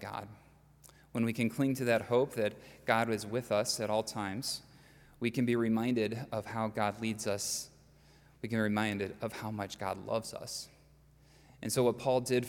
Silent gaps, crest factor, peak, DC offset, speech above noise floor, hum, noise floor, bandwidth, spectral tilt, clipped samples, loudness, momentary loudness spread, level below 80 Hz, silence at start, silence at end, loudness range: none; 22 dB; -12 dBFS; under 0.1%; 29 dB; none; -62 dBFS; 18 kHz; -4.5 dB/octave; under 0.1%; -34 LUFS; 11 LU; -68 dBFS; 0 s; 0 s; 5 LU